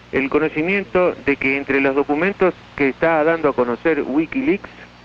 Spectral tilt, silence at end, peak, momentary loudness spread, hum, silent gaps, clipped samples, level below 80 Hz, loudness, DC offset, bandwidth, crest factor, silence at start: -8 dB/octave; 0.2 s; -6 dBFS; 4 LU; 60 Hz at -45 dBFS; none; under 0.1%; -48 dBFS; -18 LUFS; under 0.1%; 7.2 kHz; 12 dB; 0.15 s